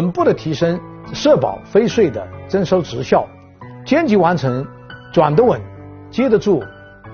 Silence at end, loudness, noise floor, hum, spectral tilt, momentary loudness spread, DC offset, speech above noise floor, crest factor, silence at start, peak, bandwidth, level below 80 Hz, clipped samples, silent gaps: 0 s; -16 LUFS; -37 dBFS; none; -6 dB/octave; 16 LU; under 0.1%; 21 dB; 16 dB; 0 s; 0 dBFS; 6.8 kHz; -48 dBFS; under 0.1%; none